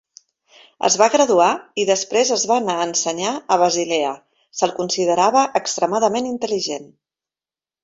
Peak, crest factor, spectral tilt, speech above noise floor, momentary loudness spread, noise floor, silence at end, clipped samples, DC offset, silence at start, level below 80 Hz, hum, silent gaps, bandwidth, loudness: -2 dBFS; 18 dB; -2.5 dB/octave; over 72 dB; 8 LU; under -90 dBFS; 1 s; under 0.1%; under 0.1%; 0.8 s; -66 dBFS; none; none; 8 kHz; -18 LUFS